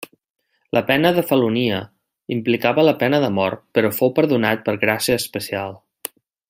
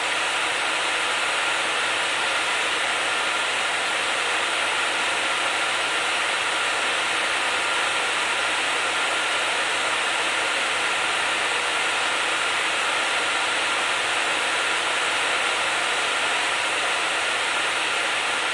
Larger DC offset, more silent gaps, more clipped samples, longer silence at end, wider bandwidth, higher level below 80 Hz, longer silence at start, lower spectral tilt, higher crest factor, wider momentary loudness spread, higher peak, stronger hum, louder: neither; first, 0.30-0.35 s vs none; neither; first, 0.4 s vs 0 s; first, 16 kHz vs 11.5 kHz; first, -58 dBFS vs -68 dBFS; about the same, 0 s vs 0 s; first, -5 dB/octave vs 0.5 dB/octave; about the same, 18 dB vs 14 dB; first, 16 LU vs 1 LU; first, -2 dBFS vs -10 dBFS; neither; about the same, -19 LUFS vs -21 LUFS